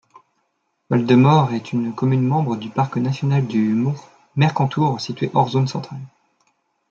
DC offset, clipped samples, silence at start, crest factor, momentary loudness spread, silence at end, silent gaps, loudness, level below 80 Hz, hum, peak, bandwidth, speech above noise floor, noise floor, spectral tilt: under 0.1%; under 0.1%; 0.9 s; 18 dB; 10 LU; 0.85 s; none; -19 LUFS; -62 dBFS; none; -2 dBFS; 7.2 kHz; 52 dB; -70 dBFS; -7.5 dB/octave